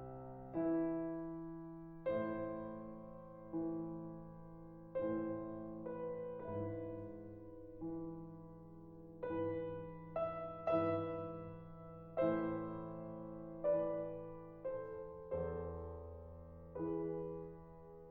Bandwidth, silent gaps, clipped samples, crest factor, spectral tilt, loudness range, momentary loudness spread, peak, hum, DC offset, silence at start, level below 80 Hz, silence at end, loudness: 4.3 kHz; none; under 0.1%; 18 dB; -10.5 dB/octave; 6 LU; 17 LU; -24 dBFS; none; under 0.1%; 0 s; -64 dBFS; 0 s; -44 LUFS